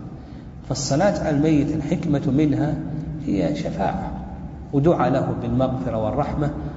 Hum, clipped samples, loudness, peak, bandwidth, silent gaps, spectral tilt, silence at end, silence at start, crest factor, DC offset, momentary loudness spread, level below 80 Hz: none; under 0.1%; -22 LUFS; -4 dBFS; 8 kHz; none; -7 dB/octave; 0 s; 0 s; 18 dB; under 0.1%; 14 LU; -38 dBFS